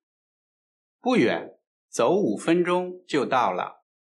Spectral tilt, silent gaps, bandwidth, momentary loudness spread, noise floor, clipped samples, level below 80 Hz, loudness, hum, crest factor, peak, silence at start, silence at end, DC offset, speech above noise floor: -5.5 dB/octave; 1.67-1.88 s; 11.5 kHz; 10 LU; under -90 dBFS; under 0.1%; -80 dBFS; -24 LUFS; none; 16 dB; -10 dBFS; 1.05 s; 0.3 s; under 0.1%; over 67 dB